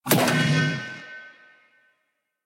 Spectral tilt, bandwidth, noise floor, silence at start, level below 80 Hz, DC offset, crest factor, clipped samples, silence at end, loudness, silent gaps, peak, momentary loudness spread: -4.5 dB/octave; 17 kHz; -76 dBFS; 0.05 s; -64 dBFS; under 0.1%; 22 dB; under 0.1%; 1.15 s; -22 LUFS; none; -4 dBFS; 21 LU